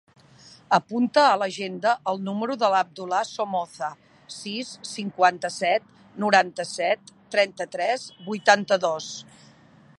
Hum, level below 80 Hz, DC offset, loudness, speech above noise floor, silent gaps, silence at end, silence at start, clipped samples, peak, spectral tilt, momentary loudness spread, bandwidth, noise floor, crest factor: none; -76 dBFS; under 0.1%; -24 LUFS; 29 dB; none; 0.75 s; 0.7 s; under 0.1%; -2 dBFS; -3.5 dB/octave; 13 LU; 11.5 kHz; -53 dBFS; 22 dB